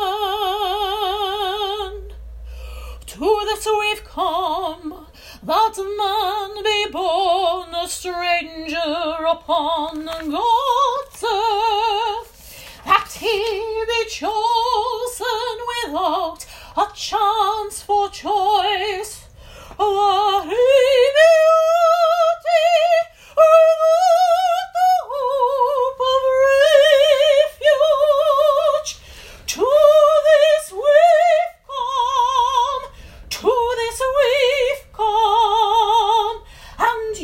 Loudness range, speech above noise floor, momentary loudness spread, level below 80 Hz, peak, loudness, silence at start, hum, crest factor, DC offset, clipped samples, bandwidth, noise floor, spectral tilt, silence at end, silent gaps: 7 LU; 22 dB; 13 LU; -44 dBFS; 0 dBFS; -17 LUFS; 0 s; none; 18 dB; under 0.1%; under 0.1%; 16.5 kHz; -41 dBFS; -2 dB/octave; 0 s; none